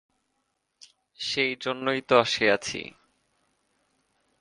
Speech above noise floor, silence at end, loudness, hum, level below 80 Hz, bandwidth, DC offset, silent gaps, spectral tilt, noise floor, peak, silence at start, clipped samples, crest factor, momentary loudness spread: 51 dB; 1.55 s; -25 LUFS; none; -68 dBFS; 11 kHz; under 0.1%; none; -3 dB/octave; -77 dBFS; -6 dBFS; 1.2 s; under 0.1%; 24 dB; 13 LU